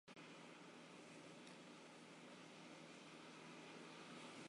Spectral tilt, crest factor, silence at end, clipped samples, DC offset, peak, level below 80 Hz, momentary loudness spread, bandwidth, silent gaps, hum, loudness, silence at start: -3.5 dB/octave; 14 dB; 0 s; under 0.1%; under 0.1%; -46 dBFS; under -90 dBFS; 3 LU; 11 kHz; none; none; -59 LUFS; 0.05 s